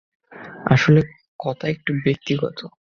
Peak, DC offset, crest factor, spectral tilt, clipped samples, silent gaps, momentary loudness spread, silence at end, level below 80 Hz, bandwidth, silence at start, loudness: 0 dBFS; under 0.1%; 20 dB; -7 dB/octave; under 0.1%; 1.28-1.39 s; 19 LU; 0.3 s; -52 dBFS; 6.8 kHz; 0.3 s; -21 LUFS